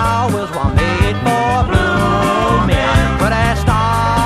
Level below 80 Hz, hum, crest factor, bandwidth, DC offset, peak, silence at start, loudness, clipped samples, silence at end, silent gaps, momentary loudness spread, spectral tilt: -22 dBFS; none; 12 dB; 14.5 kHz; under 0.1%; 0 dBFS; 0 s; -14 LUFS; under 0.1%; 0 s; none; 2 LU; -6 dB/octave